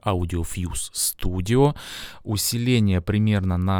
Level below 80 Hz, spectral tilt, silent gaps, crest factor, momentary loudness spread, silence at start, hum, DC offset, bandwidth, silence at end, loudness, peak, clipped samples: -38 dBFS; -5 dB/octave; none; 16 dB; 9 LU; 0.05 s; none; under 0.1%; over 20 kHz; 0 s; -23 LUFS; -6 dBFS; under 0.1%